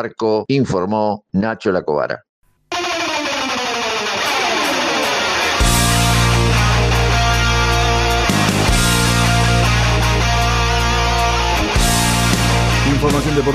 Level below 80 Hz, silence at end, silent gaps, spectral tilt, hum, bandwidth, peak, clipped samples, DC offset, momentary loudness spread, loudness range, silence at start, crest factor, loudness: -24 dBFS; 0 s; 2.29-2.42 s; -4 dB/octave; none; 15 kHz; -4 dBFS; under 0.1%; under 0.1%; 5 LU; 5 LU; 0 s; 12 dB; -15 LUFS